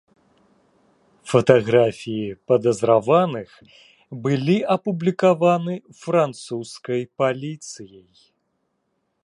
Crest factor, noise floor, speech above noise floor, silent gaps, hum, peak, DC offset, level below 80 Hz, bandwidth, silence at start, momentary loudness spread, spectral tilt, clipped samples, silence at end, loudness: 20 dB; -72 dBFS; 52 dB; none; none; 0 dBFS; under 0.1%; -64 dBFS; 11 kHz; 1.25 s; 16 LU; -6.5 dB/octave; under 0.1%; 1.35 s; -20 LUFS